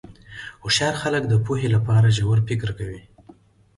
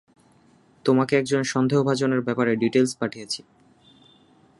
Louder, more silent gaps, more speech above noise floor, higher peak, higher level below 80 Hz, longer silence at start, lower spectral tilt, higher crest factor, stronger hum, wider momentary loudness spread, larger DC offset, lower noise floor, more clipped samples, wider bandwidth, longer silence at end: about the same, -21 LUFS vs -23 LUFS; neither; second, 31 dB vs 35 dB; about the same, -8 dBFS vs -6 dBFS; first, -46 dBFS vs -68 dBFS; second, 0.1 s vs 0.85 s; about the same, -5 dB/octave vs -5.5 dB/octave; about the same, 14 dB vs 18 dB; neither; first, 20 LU vs 10 LU; neither; second, -51 dBFS vs -57 dBFS; neither; about the same, 11.5 kHz vs 11.5 kHz; second, 0.8 s vs 1.2 s